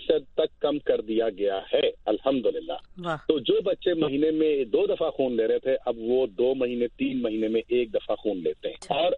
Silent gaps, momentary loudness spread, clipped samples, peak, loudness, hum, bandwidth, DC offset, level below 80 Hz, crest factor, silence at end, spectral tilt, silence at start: none; 5 LU; under 0.1%; -8 dBFS; -26 LUFS; none; 9.8 kHz; under 0.1%; -56 dBFS; 18 dB; 0 s; -6.5 dB/octave; 0 s